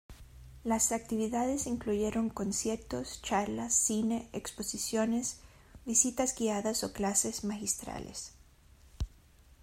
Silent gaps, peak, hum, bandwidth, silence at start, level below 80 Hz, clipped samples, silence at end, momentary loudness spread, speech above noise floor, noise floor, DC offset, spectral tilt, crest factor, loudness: none; -12 dBFS; none; 16 kHz; 0.1 s; -54 dBFS; under 0.1%; 0.1 s; 15 LU; 27 dB; -60 dBFS; under 0.1%; -3 dB/octave; 22 dB; -32 LUFS